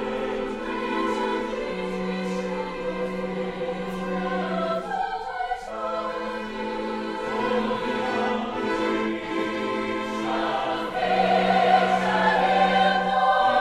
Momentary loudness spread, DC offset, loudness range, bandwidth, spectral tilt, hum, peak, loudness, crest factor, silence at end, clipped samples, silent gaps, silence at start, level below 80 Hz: 10 LU; under 0.1%; 7 LU; 12.5 kHz; -5.5 dB/octave; none; -8 dBFS; -25 LUFS; 18 dB; 0 s; under 0.1%; none; 0 s; -50 dBFS